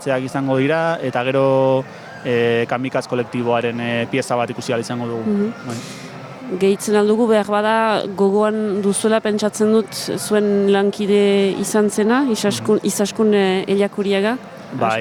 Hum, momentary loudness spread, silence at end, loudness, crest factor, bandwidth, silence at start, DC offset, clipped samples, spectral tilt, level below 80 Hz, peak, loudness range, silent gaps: none; 8 LU; 0 s; -18 LUFS; 14 dB; 17.5 kHz; 0 s; under 0.1%; under 0.1%; -5 dB/octave; -64 dBFS; -4 dBFS; 4 LU; none